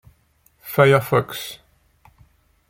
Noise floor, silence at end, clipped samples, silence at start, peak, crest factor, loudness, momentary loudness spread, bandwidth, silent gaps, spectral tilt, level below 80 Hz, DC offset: -60 dBFS; 1.15 s; under 0.1%; 0.65 s; -2 dBFS; 20 dB; -19 LUFS; 25 LU; 16.5 kHz; none; -6 dB/octave; -56 dBFS; under 0.1%